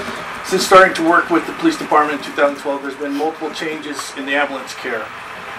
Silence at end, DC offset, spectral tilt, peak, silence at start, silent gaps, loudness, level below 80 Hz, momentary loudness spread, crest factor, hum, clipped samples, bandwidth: 0 s; under 0.1%; -3.5 dB/octave; 0 dBFS; 0 s; none; -17 LUFS; -54 dBFS; 15 LU; 18 dB; none; under 0.1%; 15.5 kHz